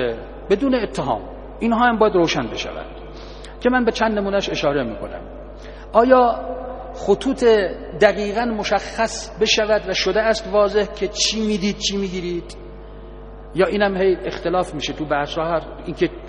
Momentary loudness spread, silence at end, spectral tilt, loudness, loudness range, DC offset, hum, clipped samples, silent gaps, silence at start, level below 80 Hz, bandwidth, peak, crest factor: 20 LU; 0 s; -4 dB/octave; -19 LUFS; 4 LU; under 0.1%; none; under 0.1%; none; 0 s; -38 dBFS; 10 kHz; 0 dBFS; 20 dB